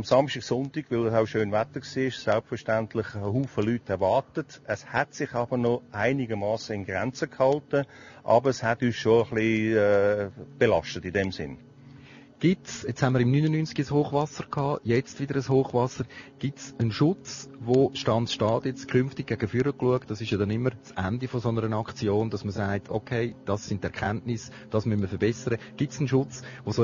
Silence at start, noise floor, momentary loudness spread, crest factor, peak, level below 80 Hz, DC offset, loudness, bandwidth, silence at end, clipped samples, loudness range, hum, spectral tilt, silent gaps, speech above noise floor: 0 s; -49 dBFS; 9 LU; 20 dB; -6 dBFS; -58 dBFS; under 0.1%; -27 LUFS; 7.4 kHz; 0 s; under 0.1%; 5 LU; none; -6.5 dB/octave; none; 23 dB